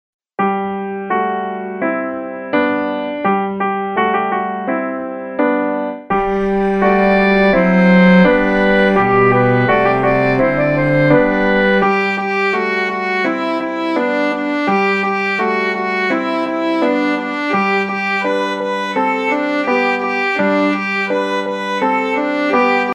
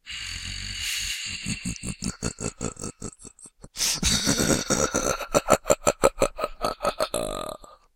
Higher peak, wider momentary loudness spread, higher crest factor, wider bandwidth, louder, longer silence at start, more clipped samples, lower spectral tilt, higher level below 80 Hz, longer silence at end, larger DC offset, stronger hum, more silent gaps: about the same, 0 dBFS vs -2 dBFS; second, 8 LU vs 15 LU; second, 14 dB vs 26 dB; second, 8.4 kHz vs 17 kHz; first, -15 LUFS vs -26 LUFS; first, 0.4 s vs 0.05 s; neither; first, -7 dB/octave vs -3 dB/octave; about the same, -42 dBFS vs -42 dBFS; second, 0 s vs 0.2 s; neither; neither; neither